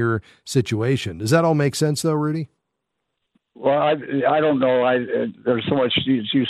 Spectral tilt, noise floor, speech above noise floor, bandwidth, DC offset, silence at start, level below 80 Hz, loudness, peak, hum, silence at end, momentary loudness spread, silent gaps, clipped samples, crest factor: -5.5 dB/octave; -78 dBFS; 58 dB; 15 kHz; under 0.1%; 0 s; -58 dBFS; -20 LUFS; -4 dBFS; none; 0 s; 7 LU; none; under 0.1%; 18 dB